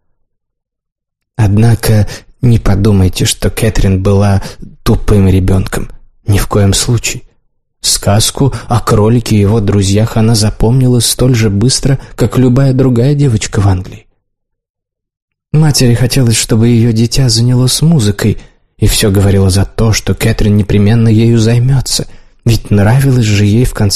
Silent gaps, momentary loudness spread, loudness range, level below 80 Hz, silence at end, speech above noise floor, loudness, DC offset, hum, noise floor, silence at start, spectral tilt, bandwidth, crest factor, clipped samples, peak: 14.70-14.74 s, 15.22-15.28 s; 6 LU; 3 LU; -22 dBFS; 0 s; 60 dB; -10 LUFS; 2%; none; -69 dBFS; 0.05 s; -5.5 dB/octave; 13 kHz; 10 dB; under 0.1%; 0 dBFS